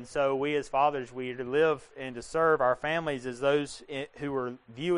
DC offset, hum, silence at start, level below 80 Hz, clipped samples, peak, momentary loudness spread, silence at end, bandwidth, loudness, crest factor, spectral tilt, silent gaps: under 0.1%; none; 0 s; -60 dBFS; under 0.1%; -12 dBFS; 11 LU; 0 s; 10.5 kHz; -29 LUFS; 16 dB; -5.5 dB/octave; none